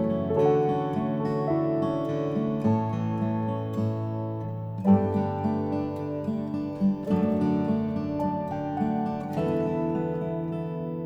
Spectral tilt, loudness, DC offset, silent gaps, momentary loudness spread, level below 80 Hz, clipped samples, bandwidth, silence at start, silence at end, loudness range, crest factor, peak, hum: -10 dB/octave; -27 LUFS; under 0.1%; none; 8 LU; -56 dBFS; under 0.1%; 7.6 kHz; 0 s; 0 s; 2 LU; 18 dB; -8 dBFS; none